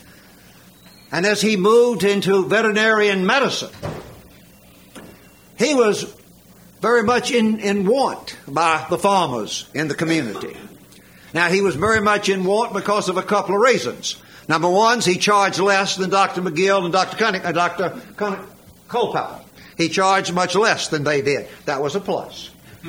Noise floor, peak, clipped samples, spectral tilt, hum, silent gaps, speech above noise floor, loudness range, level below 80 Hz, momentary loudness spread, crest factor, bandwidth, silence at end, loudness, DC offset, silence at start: -47 dBFS; -2 dBFS; under 0.1%; -4 dB/octave; none; none; 29 dB; 5 LU; -56 dBFS; 11 LU; 18 dB; 17 kHz; 0 s; -18 LUFS; under 0.1%; 1.1 s